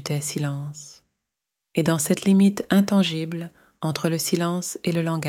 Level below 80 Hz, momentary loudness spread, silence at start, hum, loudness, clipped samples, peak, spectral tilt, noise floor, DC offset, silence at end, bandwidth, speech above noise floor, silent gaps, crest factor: -64 dBFS; 14 LU; 0 s; none; -23 LUFS; under 0.1%; -6 dBFS; -5.5 dB/octave; -84 dBFS; under 0.1%; 0 s; 16.5 kHz; 62 dB; none; 18 dB